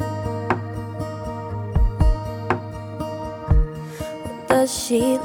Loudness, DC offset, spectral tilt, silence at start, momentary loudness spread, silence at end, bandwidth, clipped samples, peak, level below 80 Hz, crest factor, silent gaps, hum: -24 LUFS; under 0.1%; -6 dB/octave; 0 s; 11 LU; 0 s; 17.5 kHz; under 0.1%; -2 dBFS; -26 dBFS; 20 dB; none; none